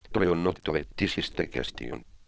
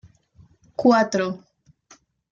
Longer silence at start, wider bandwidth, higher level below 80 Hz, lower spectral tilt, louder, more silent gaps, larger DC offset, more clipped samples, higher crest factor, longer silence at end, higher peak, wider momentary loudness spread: second, 0.05 s vs 0.8 s; about the same, 8 kHz vs 7.6 kHz; first, -46 dBFS vs -64 dBFS; about the same, -6 dB/octave vs -5.5 dB/octave; second, -29 LUFS vs -20 LUFS; neither; neither; neither; about the same, 20 dB vs 20 dB; second, 0.05 s vs 0.95 s; second, -10 dBFS vs -4 dBFS; second, 10 LU vs 19 LU